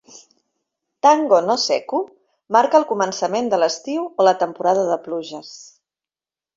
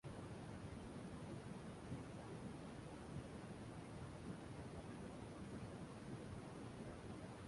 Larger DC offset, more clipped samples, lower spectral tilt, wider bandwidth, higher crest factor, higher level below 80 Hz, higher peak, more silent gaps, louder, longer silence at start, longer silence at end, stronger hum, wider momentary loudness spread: neither; neither; second, -3.5 dB/octave vs -6.5 dB/octave; second, 7.8 kHz vs 11.5 kHz; about the same, 18 dB vs 16 dB; about the same, -68 dBFS vs -66 dBFS; first, -2 dBFS vs -38 dBFS; neither; first, -18 LUFS vs -54 LUFS; about the same, 0.15 s vs 0.05 s; first, 0.95 s vs 0 s; neither; first, 13 LU vs 1 LU